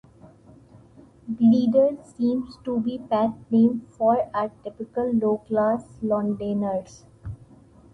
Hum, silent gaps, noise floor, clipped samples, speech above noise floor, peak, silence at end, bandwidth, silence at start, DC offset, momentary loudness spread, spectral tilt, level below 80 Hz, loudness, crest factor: none; none; -51 dBFS; under 0.1%; 28 dB; -8 dBFS; 0.6 s; 7.6 kHz; 1.25 s; under 0.1%; 17 LU; -8.5 dB/octave; -56 dBFS; -23 LUFS; 16 dB